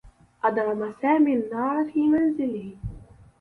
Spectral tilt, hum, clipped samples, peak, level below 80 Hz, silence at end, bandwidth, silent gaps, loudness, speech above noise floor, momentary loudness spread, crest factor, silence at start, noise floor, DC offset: -9 dB/octave; none; under 0.1%; -10 dBFS; -50 dBFS; 0.35 s; 4.4 kHz; none; -24 LUFS; 22 dB; 14 LU; 16 dB; 0.05 s; -45 dBFS; under 0.1%